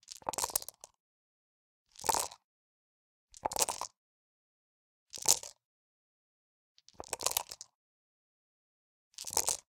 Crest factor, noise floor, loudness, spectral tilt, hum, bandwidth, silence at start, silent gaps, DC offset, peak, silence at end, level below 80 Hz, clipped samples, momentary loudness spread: 36 dB; under -90 dBFS; -34 LUFS; 0.5 dB/octave; none; 17.5 kHz; 0.1 s; 1.00-1.86 s, 2.44-3.27 s, 3.97-5.06 s, 5.65-6.75 s, 7.75-9.11 s; under 0.1%; -4 dBFS; 0.1 s; -68 dBFS; under 0.1%; 20 LU